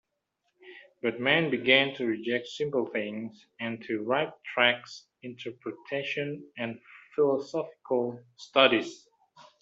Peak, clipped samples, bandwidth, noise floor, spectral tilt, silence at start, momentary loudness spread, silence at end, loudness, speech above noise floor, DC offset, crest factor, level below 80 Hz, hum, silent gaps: -6 dBFS; under 0.1%; 7.8 kHz; -79 dBFS; -5 dB/octave; 0.65 s; 18 LU; 0.2 s; -28 LUFS; 50 dB; under 0.1%; 24 dB; -76 dBFS; none; none